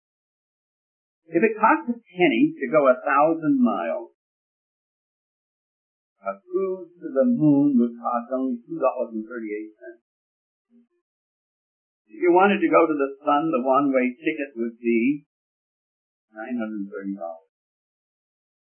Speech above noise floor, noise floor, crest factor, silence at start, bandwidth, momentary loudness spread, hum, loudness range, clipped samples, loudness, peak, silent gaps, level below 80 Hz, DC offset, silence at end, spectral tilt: over 68 dB; under -90 dBFS; 20 dB; 1.3 s; 3.3 kHz; 14 LU; none; 12 LU; under 0.1%; -22 LUFS; -4 dBFS; 4.15-6.16 s, 10.01-10.65 s, 11.01-12.05 s, 15.26-16.28 s; -82 dBFS; under 0.1%; 1.25 s; -11 dB/octave